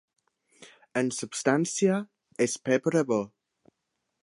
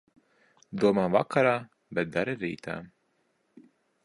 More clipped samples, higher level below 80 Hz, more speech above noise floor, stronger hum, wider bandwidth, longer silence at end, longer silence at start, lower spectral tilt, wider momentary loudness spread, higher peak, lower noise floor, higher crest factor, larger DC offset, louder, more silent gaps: neither; second, -76 dBFS vs -66 dBFS; first, 55 dB vs 46 dB; neither; about the same, 11.5 kHz vs 11.5 kHz; second, 0.95 s vs 1.2 s; about the same, 0.6 s vs 0.7 s; second, -4.5 dB/octave vs -7 dB/octave; second, 8 LU vs 14 LU; about the same, -8 dBFS vs -8 dBFS; first, -81 dBFS vs -73 dBFS; about the same, 22 dB vs 20 dB; neither; about the same, -27 LUFS vs -28 LUFS; neither